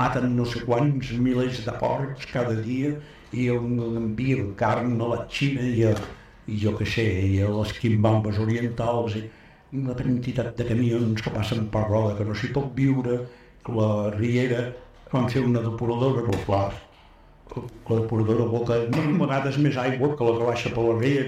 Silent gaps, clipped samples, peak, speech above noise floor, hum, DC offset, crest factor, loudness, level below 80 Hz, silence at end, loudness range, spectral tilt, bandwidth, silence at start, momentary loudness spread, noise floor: none; under 0.1%; -8 dBFS; 28 dB; none; under 0.1%; 16 dB; -25 LUFS; -48 dBFS; 0 s; 2 LU; -7.5 dB/octave; 10.5 kHz; 0 s; 7 LU; -51 dBFS